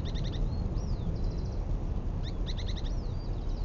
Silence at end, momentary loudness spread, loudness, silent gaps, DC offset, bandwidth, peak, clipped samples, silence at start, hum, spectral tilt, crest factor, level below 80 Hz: 0 s; 2 LU; -36 LUFS; none; under 0.1%; 7 kHz; -20 dBFS; under 0.1%; 0 s; none; -7 dB/octave; 12 dB; -34 dBFS